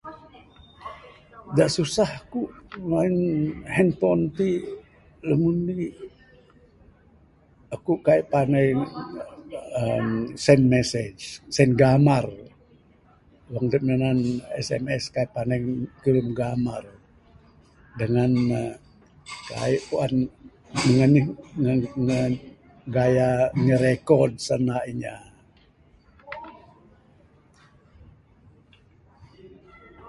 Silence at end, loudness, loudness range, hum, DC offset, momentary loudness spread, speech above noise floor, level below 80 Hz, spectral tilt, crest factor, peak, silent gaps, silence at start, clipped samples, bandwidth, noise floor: 0 s; -23 LUFS; 6 LU; none; under 0.1%; 19 LU; 35 dB; -52 dBFS; -7 dB/octave; 24 dB; -2 dBFS; none; 0.05 s; under 0.1%; 11.5 kHz; -57 dBFS